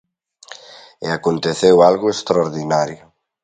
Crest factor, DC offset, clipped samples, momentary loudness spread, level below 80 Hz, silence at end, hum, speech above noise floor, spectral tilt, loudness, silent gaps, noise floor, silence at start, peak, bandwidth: 18 dB; under 0.1%; under 0.1%; 22 LU; -56 dBFS; 0.5 s; none; 27 dB; -5 dB/octave; -16 LUFS; none; -43 dBFS; 0.5 s; 0 dBFS; 9.4 kHz